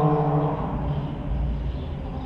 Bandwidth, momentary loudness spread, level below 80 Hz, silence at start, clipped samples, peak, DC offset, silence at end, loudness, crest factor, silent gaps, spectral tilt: 5.2 kHz; 9 LU; -32 dBFS; 0 s; under 0.1%; -10 dBFS; under 0.1%; 0 s; -27 LUFS; 14 dB; none; -10.5 dB/octave